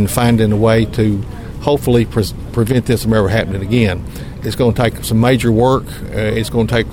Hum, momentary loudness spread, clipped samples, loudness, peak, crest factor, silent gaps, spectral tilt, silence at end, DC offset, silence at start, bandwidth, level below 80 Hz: none; 10 LU; under 0.1%; -15 LUFS; 0 dBFS; 14 dB; none; -6.5 dB/octave; 0 s; under 0.1%; 0 s; 17 kHz; -30 dBFS